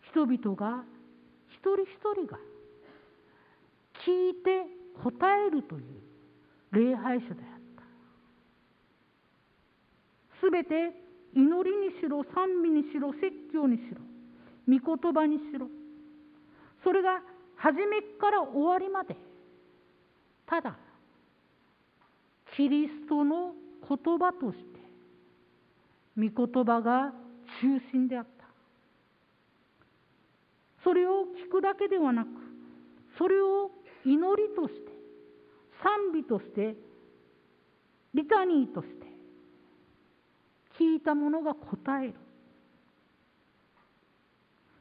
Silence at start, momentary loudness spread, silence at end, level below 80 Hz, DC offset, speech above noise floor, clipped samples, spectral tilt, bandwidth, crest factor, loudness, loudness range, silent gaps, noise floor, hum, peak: 0.15 s; 18 LU; 2.7 s; -76 dBFS; under 0.1%; 40 dB; under 0.1%; -10 dB/octave; 4.9 kHz; 22 dB; -29 LUFS; 6 LU; none; -68 dBFS; none; -10 dBFS